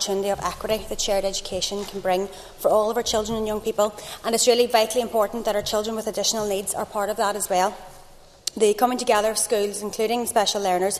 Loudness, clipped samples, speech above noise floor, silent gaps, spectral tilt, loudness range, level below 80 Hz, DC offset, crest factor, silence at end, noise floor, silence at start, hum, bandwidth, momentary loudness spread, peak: -23 LUFS; under 0.1%; 24 dB; none; -2.5 dB/octave; 2 LU; -46 dBFS; under 0.1%; 20 dB; 0 s; -47 dBFS; 0 s; none; 14 kHz; 7 LU; -2 dBFS